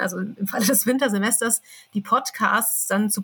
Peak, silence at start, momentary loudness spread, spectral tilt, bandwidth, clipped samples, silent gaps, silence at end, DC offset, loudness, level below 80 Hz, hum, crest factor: -6 dBFS; 0 s; 8 LU; -3 dB/octave; 19.5 kHz; under 0.1%; none; 0 s; under 0.1%; -21 LUFS; -84 dBFS; none; 18 dB